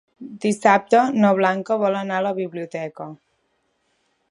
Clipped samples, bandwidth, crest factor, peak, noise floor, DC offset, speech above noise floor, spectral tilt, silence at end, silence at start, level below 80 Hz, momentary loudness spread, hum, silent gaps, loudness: under 0.1%; 11.5 kHz; 20 dB; -2 dBFS; -69 dBFS; under 0.1%; 49 dB; -6 dB/octave; 1.15 s; 0.2 s; -72 dBFS; 16 LU; none; none; -20 LUFS